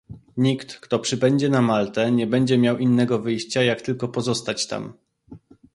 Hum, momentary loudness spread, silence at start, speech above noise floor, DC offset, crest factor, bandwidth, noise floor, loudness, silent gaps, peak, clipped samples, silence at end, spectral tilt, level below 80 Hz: none; 8 LU; 0.1 s; 25 dB; under 0.1%; 16 dB; 11.5 kHz; -46 dBFS; -22 LUFS; none; -6 dBFS; under 0.1%; 0.4 s; -5.5 dB/octave; -58 dBFS